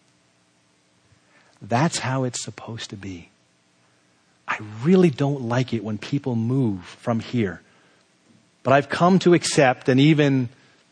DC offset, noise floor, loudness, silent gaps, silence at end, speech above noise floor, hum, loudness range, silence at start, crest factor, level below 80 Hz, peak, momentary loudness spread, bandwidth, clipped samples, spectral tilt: under 0.1%; -62 dBFS; -21 LUFS; none; 0.4 s; 42 dB; none; 9 LU; 1.6 s; 20 dB; -64 dBFS; -4 dBFS; 17 LU; 10 kHz; under 0.1%; -6 dB/octave